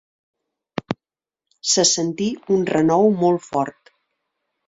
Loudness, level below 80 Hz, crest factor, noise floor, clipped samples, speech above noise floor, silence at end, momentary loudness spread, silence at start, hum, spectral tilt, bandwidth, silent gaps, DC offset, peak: -19 LUFS; -62 dBFS; 20 dB; -90 dBFS; under 0.1%; 72 dB; 0.95 s; 16 LU; 0.9 s; none; -3.5 dB/octave; 8 kHz; none; under 0.1%; -2 dBFS